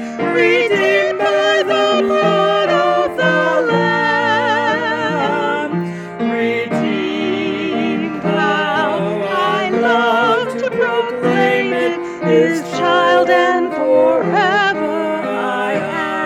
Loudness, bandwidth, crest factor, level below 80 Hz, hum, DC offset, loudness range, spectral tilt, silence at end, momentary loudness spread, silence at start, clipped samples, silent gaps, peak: -15 LUFS; 13 kHz; 14 dB; -58 dBFS; none; under 0.1%; 4 LU; -5.5 dB/octave; 0 s; 6 LU; 0 s; under 0.1%; none; -2 dBFS